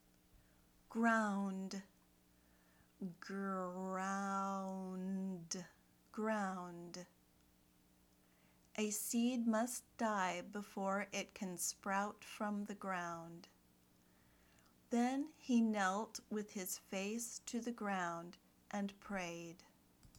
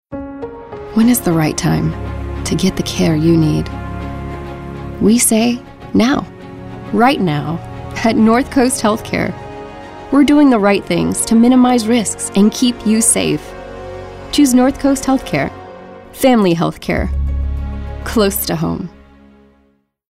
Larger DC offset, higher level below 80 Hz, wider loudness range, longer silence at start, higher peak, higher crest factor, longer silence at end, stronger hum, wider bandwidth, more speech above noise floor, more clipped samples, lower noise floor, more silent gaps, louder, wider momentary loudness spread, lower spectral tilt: neither; second, -78 dBFS vs -30 dBFS; about the same, 5 LU vs 4 LU; first, 0.35 s vs 0.1 s; second, -24 dBFS vs 0 dBFS; first, 20 dB vs 14 dB; second, 0 s vs 1.2 s; first, 60 Hz at -75 dBFS vs none; first, over 20 kHz vs 16 kHz; second, 30 dB vs 44 dB; neither; first, -72 dBFS vs -57 dBFS; neither; second, -42 LUFS vs -14 LUFS; second, 14 LU vs 18 LU; about the same, -4.5 dB/octave vs -5 dB/octave